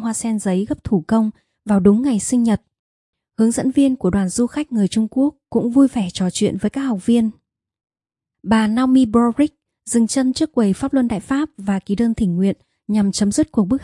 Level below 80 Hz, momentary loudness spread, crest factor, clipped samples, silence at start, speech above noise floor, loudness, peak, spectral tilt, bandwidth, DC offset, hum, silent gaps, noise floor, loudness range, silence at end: -46 dBFS; 7 LU; 16 dB; under 0.1%; 0 s; 67 dB; -18 LUFS; -2 dBFS; -6 dB/octave; 11.5 kHz; under 0.1%; none; 2.79-3.13 s; -84 dBFS; 2 LU; 0 s